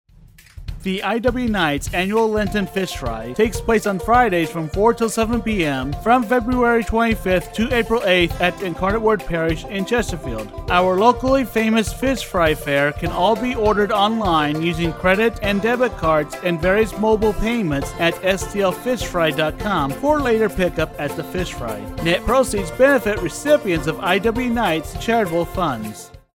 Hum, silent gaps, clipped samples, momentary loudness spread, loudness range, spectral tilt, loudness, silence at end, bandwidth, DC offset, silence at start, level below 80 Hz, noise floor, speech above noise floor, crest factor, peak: none; none; under 0.1%; 7 LU; 2 LU; -5 dB/octave; -19 LUFS; 0.2 s; 17.5 kHz; under 0.1%; 0.25 s; -34 dBFS; -47 dBFS; 28 dB; 18 dB; 0 dBFS